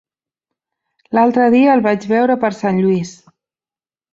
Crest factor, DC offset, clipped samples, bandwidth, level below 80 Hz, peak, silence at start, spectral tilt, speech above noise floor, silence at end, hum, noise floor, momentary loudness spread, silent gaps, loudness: 14 dB; under 0.1%; under 0.1%; 7.6 kHz; -60 dBFS; -2 dBFS; 1.1 s; -7 dB/octave; over 77 dB; 1 s; none; under -90 dBFS; 8 LU; none; -14 LUFS